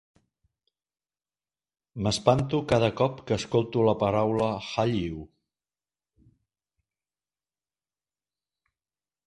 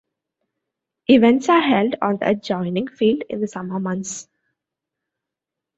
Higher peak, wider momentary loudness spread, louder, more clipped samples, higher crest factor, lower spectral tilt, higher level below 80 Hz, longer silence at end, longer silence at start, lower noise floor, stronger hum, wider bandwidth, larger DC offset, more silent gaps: about the same, -4 dBFS vs -2 dBFS; second, 8 LU vs 13 LU; second, -26 LUFS vs -19 LUFS; neither; first, 26 dB vs 18 dB; about the same, -6 dB/octave vs -5.5 dB/octave; first, -54 dBFS vs -62 dBFS; first, 4 s vs 1.55 s; first, 1.95 s vs 1.1 s; first, under -90 dBFS vs -85 dBFS; first, 50 Hz at -55 dBFS vs none; first, 11.5 kHz vs 8.2 kHz; neither; neither